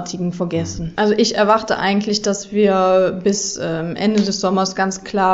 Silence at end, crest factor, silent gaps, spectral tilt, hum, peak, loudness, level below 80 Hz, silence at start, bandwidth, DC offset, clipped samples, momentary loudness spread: 0 s; 16 dB; none; -4.5 dB/octave; none; -2 dBFS; -18 LUFS; -46 dBFS; 0 s; 8 kHz; under 0.1%; under 0.1%; 8 LU